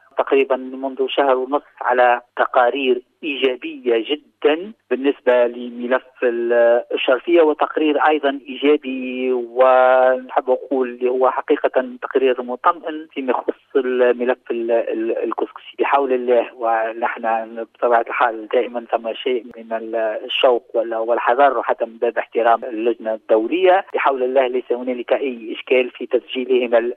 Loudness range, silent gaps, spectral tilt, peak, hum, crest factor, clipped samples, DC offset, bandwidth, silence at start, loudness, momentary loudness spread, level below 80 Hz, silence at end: 3 LU; none; -5.5 dB/octave; -2 dBFS; none; 16 dB; under 0.1%; under 0.1%; 4.1 kHz; 0.15 s; -19 LUFS; 8 LU; -72 dBFS; 0 s